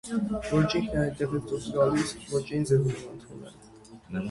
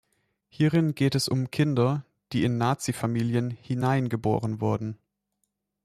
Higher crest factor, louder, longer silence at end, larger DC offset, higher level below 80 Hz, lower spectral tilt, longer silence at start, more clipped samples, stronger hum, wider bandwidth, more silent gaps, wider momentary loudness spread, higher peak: about the same, 18 dB vs 16 dB; about the same, -28 LUFS vs -26 LUFS; second, 0 s vs 0.9 s; neither; first, -50 dBFS vs -60 dBFS; about the same, -6.5 dB/octave vs -6.5 dB/octave; second, 0.05 s vs 0.6 s; neither; neither; second, 11.5 kHz vs 14 kHz; neither; first, 18 LU vs 8 LU; about the same, -10 dBFS vs -12 dBFS